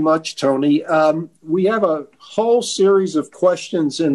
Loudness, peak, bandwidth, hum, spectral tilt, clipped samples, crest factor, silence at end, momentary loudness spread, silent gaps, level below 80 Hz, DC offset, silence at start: -18 LUFS; -4 dBFS; 12 kHz; none; -5 dB/octave; under 0.1%; 12 dB; 0 s; 7 LU; none; -66 dBFS; under 0.1%; 0 s